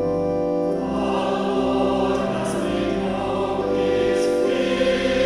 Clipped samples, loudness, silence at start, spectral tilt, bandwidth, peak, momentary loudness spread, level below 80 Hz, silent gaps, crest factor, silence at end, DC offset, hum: under 0.1%; -22 LUFS; 0 s; -6 dB/octave; 13 kHz; -8 dBFS; 3 LU; -42 dBFS; none; 14 dB; 0 s; under 0.1%; none